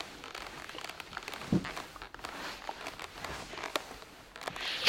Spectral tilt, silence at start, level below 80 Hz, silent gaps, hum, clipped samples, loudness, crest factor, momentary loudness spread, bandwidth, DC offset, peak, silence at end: -4 dB/octave; 0 s; -60 dBFS; none; none; under 0.1%; -40 LUFS; 28 dB; 10 LU; 17 kHz; under 0.1%; -10 dBFS; 0 s